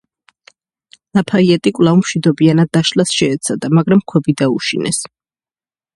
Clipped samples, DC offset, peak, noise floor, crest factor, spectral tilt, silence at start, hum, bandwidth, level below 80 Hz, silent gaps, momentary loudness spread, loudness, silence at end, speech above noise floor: under 0.1%; under 0.1%; 0 dBFS; under -90 dBFS; 14 dB; -5.5 dB/octave; 1.15 s; none; 11.5 kHz; -54 dBFS; none; 7 LU; -14 LUFS; 0.9 s; over 77 dB